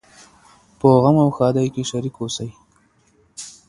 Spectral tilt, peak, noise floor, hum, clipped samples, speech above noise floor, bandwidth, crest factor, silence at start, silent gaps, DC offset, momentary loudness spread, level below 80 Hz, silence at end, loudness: -7 dB/octave; 0 dBFS; -59 dBFS; none; under 0.1%; 41 dB; 11.5 kHz; 20 dB; 0.85 s; none; under 0.1%; 21 LU; -54 dBFS; 0.2 s; -18 LUFS